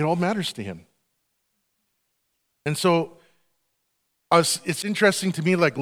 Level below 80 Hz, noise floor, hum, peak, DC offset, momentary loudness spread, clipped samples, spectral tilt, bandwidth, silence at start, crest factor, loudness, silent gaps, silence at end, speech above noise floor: -70 dBFS; -75 dBFS; none; -4 dBFS; under 0.1%; 15 LU; under 0.1%; -4.5 dB/octave; 17 kHz; 0 s; 22 dB; -22 LUFS; none; 0 s; 52 dB